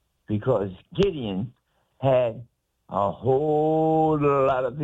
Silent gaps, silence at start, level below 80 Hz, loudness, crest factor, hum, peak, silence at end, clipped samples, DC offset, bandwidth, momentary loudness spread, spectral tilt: none; 0.3 s; -50 dBFS; -24 LUFS; 14 dB; none; -10 dBFS; 0 s; under 0.1%; under 0.1%; 7.8 kHz; 11 LU; -9 dB/octave